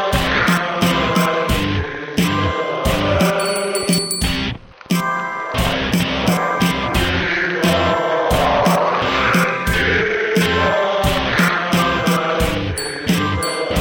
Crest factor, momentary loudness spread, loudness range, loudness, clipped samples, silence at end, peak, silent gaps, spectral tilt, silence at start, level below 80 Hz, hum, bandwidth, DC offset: 14 dB; 5 LU; 3 LU; -17 LUFS; under 0.1%; 0 s; -2 dBFS; none; -4.5 dB/octave; 0 s; -32 dBFS; none; 19.5 kHz; under 0.1%